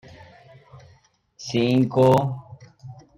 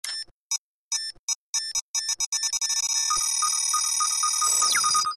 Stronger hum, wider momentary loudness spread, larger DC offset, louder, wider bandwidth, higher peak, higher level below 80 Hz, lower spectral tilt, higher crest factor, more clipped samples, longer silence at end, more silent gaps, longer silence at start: neither; first, 24 LU vs 11 LU; neither; first, -20 LUFS vs -23 LUFS; first, 16 kHz vs 13 kHz; first, -6 dBFS vs -10 dBFS; first, -60 dBFS vs -66 dBFS; first, -7 dB/octave vs 4 dB/octave; about the same, 18 dB vs 16 dB; neither; first, 0.25 s vs 0 s; second, none vs 0.31-0.50 s, 0.58-0.91 s, 1.19-1.28 s, 1.35-1.53 s, 1.82-1.94 s, 2.26-2.32 s; first, 0.75 s vs 0.05 s